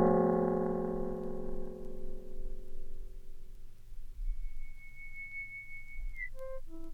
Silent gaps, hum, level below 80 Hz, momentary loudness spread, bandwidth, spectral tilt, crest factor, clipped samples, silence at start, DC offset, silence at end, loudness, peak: none; none; -42 dBFS; 24 LU; 2.4 kHz; -9.5 dB/octave; 20 dB; under 0.1%; 0 s; under 0.1%; 0 s; -38 LUFS; -14 dBFS